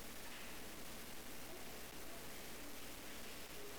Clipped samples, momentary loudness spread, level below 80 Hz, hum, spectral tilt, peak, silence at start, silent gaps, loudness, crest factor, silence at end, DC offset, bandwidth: under 0.1%; 1 LU; -64 dBFS; none; -2.5 dB/octave; -40 dBFS; 0 s; none; -51 LUFS; 8 dB; 0 s; 0.3%; 19 kHz